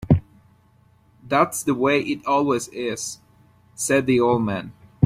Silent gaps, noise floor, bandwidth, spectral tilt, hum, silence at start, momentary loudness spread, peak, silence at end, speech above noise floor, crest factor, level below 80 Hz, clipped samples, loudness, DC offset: none; -57 dBFS; 16 kHz; -5.5 dB/octave; none; 0 s; 11 LU; -2 dBFS; 0 s; 36 dB; 20 dB; -48 dBFS; under 0.1%; -22 LUFS; under 0.1%